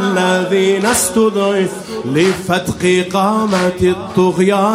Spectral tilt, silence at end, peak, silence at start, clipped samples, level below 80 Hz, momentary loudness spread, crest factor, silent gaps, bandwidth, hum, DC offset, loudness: -4.5 dB/octave; 0 s; 0 dBFS; 0 s; under 0.1%; -46 dBFS; 5 LU; 14 dB; none; 16 kHz; none; under 0.1%; -14 LUFS